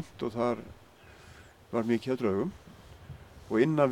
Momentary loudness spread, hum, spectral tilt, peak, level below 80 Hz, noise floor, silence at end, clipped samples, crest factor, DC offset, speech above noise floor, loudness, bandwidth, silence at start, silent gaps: 24 LU; none; -7.5 dB/octave; -10 dBFS; -60 dBFS; -54 dBFS; 0 s; under 0.1%; 20 dB; under 0.1%; 25 dB; -31 LUFS; 15 kHz; 0 s; none